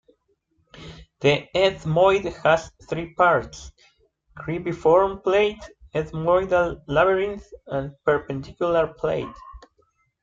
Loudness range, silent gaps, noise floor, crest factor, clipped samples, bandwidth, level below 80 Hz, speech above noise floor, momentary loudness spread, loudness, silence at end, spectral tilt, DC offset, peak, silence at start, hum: 2 LU; none; -68 dBFS; 18 dB; under 0.1%; 7.8 kHz; -48 dBFS; 46 dB; 17 LU; -22 LUFS; 0.65 s; -6 dB/octave; under 0.1%; -6 dBFS; 0.75 s; none